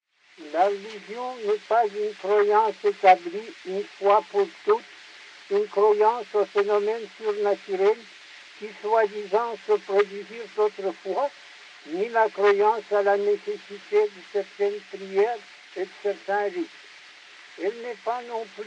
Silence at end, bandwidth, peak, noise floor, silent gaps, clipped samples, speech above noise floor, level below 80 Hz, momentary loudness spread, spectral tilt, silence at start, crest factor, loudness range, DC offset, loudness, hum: 0 s; 8.4 kHz; -4 dBFS; -48 dBFS; none; under 0.1%; 24 dB; -84 dBFS; 16 LU; -4.5 dB/octave; 0.4 s; 20 dB; 6 LU; under 0.1%; -25 LUFS; none